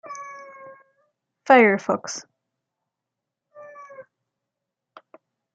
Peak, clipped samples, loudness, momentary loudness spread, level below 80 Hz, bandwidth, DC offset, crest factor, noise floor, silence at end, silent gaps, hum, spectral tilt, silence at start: -2 dBFS; under 0.1%; -18 LUFS; 28 LU; -80 dBFS; 9.2 kHz; under 0.1%; 24 dB; -85 dBFS; 1.55 s; none; none; -4.5 dB/octave; 0.1 s